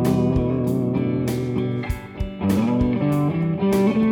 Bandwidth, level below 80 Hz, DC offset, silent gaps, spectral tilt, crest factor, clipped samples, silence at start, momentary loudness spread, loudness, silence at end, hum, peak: 18.5 kHz; -36 dBFS; under 0.1%; none; -8 dB/octave; 14 dB; under 0.1%; 0 s; 7 LU; -22 LUFS; 0 s; none; -6 dBFS